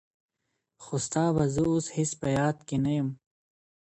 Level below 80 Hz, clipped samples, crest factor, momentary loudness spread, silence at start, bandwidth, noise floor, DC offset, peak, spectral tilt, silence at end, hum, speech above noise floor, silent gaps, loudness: -56 dBFS; under 0.1%; 16 dB; 8 LU; 0.8 s; 10.5 kHz; -81 dBFS; under 0.1%; -14 dBFS; -6 dB/octave; 0.8 s; none; 54 dB; none; -28 LUFS